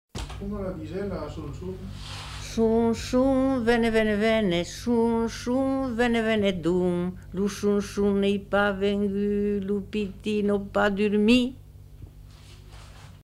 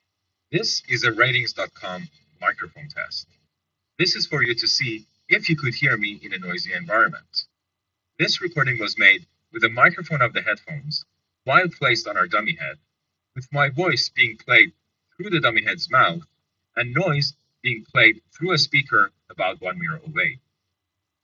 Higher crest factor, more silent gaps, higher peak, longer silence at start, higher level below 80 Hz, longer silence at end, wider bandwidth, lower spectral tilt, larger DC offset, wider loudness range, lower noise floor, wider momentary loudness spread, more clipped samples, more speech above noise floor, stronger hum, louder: second, 16 dB vs 22 dB; neither; second, -8 dBFS vs 0 dBFS; second, 0.15 s vs 0.5 s; first, -44 dBFS vs -66 dBFS; second, 0.05 s vs 0.85 s; first, 13.5 kHz vs 7.6 kHz; first, -6 dB/octave vs -2 dB/octave; neither; about the same, 3 LU vs 4 LU; second, -46 dBFS vs -81 dBFS; about the same, 13 LU vs 14 LU; neither; second, 22 dB vs 59 dB; first, 50 Hz at -70 dBFS vs none; second, -25 LUFS vs -20 LUFS